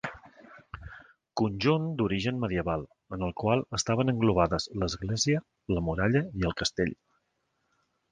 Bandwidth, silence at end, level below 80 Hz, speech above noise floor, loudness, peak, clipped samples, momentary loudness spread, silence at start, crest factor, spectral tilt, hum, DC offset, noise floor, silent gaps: 10.5 kHz; 1.15 s; -48 dBFS; 49 dB; -29 LUFS; -8 dBFS; under 0.1%; 14 LU; 0.05 s; 22 dB; -5 dB/octave; none; under 0.1%; -77 dBFS; none